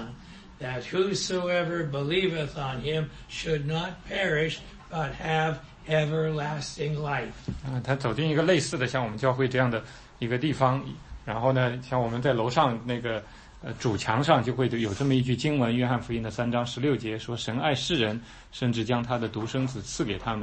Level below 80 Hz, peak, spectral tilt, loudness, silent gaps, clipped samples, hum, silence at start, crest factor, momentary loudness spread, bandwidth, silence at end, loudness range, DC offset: -50 dBFS; -6 dBFS; -5.5 dB/octave; -28 LUFS; none; under 0.1%; none; 0 s; 20 dB; 10 LU; 8.8 kHz; 0 s; 3 LU; under 0.1%